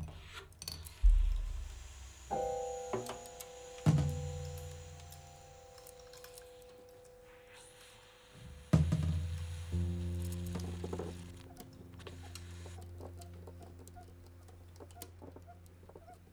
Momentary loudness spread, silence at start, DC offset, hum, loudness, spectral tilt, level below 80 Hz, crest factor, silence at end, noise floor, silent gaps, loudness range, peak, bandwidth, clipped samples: 23 LU; 0 s; under 0.1%; none; -39 LUFS; -6.5 dB/octave; -42 dBFS; 26 dB; 0.05 s; -59 dBFS; none; 16 LU; -12 dBFS; over 20 kHz; under 0.1%